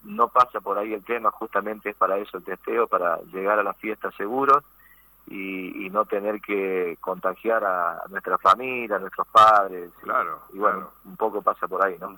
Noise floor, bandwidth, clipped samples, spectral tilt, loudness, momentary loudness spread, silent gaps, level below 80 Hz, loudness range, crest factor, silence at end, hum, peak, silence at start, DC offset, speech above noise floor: -54 dBFS; 19.5 kHz; under 0.1%; -5 dB/octave; -23 LUFS; 12 LU; none; -64 dBFS; 5 LU; 18 dB; 0 s; none; -6 dBFS; 0.05 s; under 0.1%; 30 dB